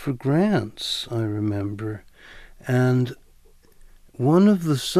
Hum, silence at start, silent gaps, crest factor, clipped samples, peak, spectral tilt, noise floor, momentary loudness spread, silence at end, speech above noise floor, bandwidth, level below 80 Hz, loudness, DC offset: none; 0 s; none; 16 dB; under 0.1%; -6 dBFS; -6.5 dB/octave; -52 dBFS; 14 LU; 0 s; 31 dB; 14.5 kHz; -52 dBFS; -22 LUFS; under 0.1%